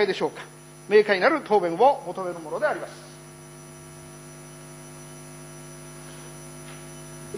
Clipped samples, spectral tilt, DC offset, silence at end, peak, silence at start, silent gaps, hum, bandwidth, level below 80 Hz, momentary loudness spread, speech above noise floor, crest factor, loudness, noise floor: under 0.1%; -4.5 dB/octave; under 0.1%; 0 s; -6 dBFS; 0 s; none; 50 Hz at -50 dBFS; 10.5 kHz; -62 dBFS; 22 LU; 21 dB; 22 dB; -23 LUFS; -44 dBFS